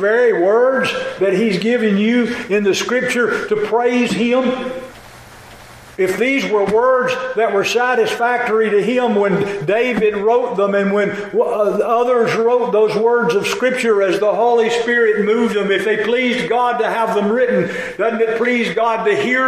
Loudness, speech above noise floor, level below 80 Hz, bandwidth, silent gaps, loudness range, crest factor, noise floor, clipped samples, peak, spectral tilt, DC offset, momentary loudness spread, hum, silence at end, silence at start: -16 LUFS; 23 dB; -56 dBFS; 14.5 kHz; none; 3 LU; 10 dB; -39 dBFS; under 0.1%; -4 dBFS; -5 dB/octave; under 0.1%; 4 LU; none; 0 s; 0 s